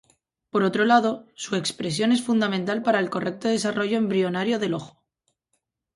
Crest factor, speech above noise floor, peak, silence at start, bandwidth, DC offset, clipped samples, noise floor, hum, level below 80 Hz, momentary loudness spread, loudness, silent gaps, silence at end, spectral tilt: 20 dB; 53 dB; -4 dBFS; 0.55 s; 11.5 kHz; under 0.1%; under 0.1%; -76 dBFS; none; -68 dBFS; 9 LU; -24 LUFS; none; 1.1 s; -5 dB/octave